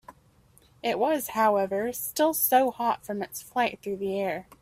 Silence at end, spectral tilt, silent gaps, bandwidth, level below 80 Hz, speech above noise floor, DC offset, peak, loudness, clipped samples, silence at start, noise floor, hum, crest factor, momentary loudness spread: 0.2 s; -3.5 dB/octave; none; 16 kHz; -66 dBFS; 33 dB; under 0.1%; -10 dBFS; -27 LUFS; under 0.1%; 0.1 s; -60 dBFS; none; 18 dB; 10 LU